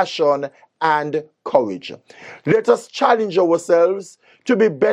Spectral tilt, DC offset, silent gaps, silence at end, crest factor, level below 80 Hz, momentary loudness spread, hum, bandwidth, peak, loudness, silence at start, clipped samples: -5.5 dB/octave; under 0.1%; none; 0 s; 18 dB; -68 dBFS; 14 LU; none; 11 kHz; 0 dBFS; -18 LUFS; 0 s; under 0.1%